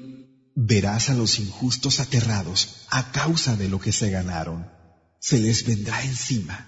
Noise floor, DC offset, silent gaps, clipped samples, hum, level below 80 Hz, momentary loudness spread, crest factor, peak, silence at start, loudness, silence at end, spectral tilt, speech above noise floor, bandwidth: -44 dBFS; under 0.1%; none; under 0.1%; none; -48 dBFS; 10 LU; 18 dB; -6 dBFS; 0 s; -23 LUFS; 0 s; -4 dB/octave; 21 dB; 8 kHz